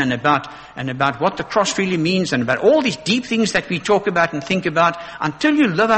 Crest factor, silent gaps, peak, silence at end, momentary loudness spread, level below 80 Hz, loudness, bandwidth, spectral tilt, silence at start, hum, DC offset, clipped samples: 16 dB; none; -2 dBFS; 0 s; 6 LU; -52 dBFS; -18 LUFS; 8.8 kHz; -4.5 dB/octave; 0 s; none; under 0.1%; under 0.1%